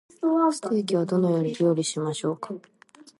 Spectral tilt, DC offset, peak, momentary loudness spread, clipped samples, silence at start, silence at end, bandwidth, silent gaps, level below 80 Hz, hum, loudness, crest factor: -6 dB/octave; under 0.1%; -10 dBFS; 10 LU; under 0.1%; 0.2 s; 0.6 s; 11.5 kHz; none; -76 dBFS; none; -25 LUFS; 14 dB